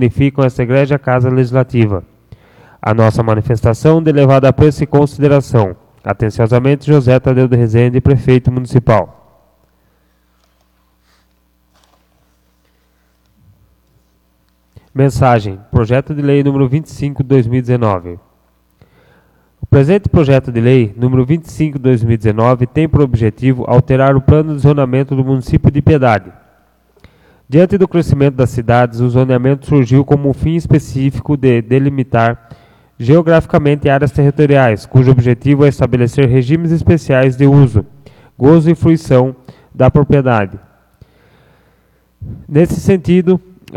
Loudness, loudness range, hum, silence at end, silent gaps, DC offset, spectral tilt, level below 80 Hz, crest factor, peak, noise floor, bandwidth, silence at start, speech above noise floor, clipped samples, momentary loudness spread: -11 LUFS; 5 LU; none; 0.4 s; none; under 0.1%; -8.5 dB/octave; -34 dBFS; 12 dB; 0 dBFS; -56 dBFS; 11 kHz; 0 s; 46 dB; 0.1%; 6 LU